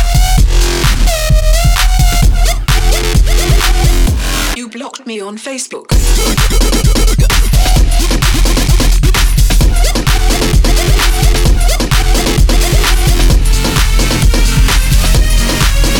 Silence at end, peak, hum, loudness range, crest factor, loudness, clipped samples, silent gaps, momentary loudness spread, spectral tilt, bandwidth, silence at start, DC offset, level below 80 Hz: 0 s; 0 dBFS; none; 3 LU; 8 dB; -11 LUFS; under 0.1%; none; 3 LU; -4 dB/octave; 18.5 kHz; 0 s; 0.4%; -10 dBFS